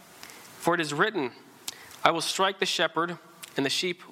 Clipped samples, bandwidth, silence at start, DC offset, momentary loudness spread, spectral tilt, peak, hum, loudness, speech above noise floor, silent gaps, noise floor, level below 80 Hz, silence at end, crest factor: under 0.1%; 17 kHz; 0.15 s; under 0.1%; 15 LU; -3 dB/octave; -4 dBFS; none; -27 LUFS; 21 dB; none; -48 dBFS; -74 dBFS; 0 s; 24 dB